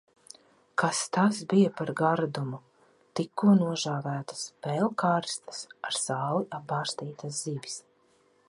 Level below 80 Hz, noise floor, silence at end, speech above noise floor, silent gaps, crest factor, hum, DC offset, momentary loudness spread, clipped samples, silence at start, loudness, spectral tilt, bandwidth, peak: -76 dBFS; -66 dBFS; 0.7 s; 37 dB; none; 20 dB; none; under 0.1%; 13 LU; under 0.1%; 0.75 s; -29 LUFS; -5 dB/octave; 11.5 kHz; -10 dBFS